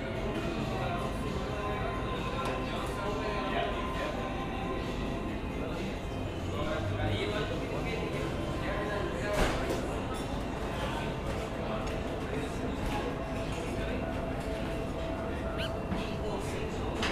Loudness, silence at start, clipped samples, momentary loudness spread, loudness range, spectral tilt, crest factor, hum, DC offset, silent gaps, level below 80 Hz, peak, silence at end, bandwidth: -34 LUFS; 0 s; under 0.1%; 3 LU; 2 LU; -6 dB/octave; 18 dB; none; under 0.1%; none; -42 dBFS; -16 dBFS; 0 s; 15.5 kHz